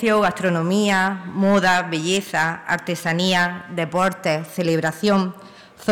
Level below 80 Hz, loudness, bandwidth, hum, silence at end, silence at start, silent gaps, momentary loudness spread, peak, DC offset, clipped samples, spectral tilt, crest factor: -58 dBFS; -20 LUFS; 17 kHz; none; 0 s; 0 s; none; 6 LU; -10 dBFS; under 0.1%; under 0.1%; -5 dB/octave; 10 dB